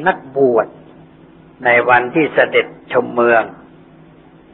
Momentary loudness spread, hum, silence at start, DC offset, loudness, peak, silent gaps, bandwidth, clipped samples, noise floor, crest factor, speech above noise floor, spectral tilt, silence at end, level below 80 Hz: 7 LU; none; 0 s; under 0.1%; -14 LUFS; 0 dBFS; none; 4.2 kHz; under 0.1%; -44 dBFS; 16 dB; 29 dB; -9.5 dB/octave; 1 s; -58 dBFS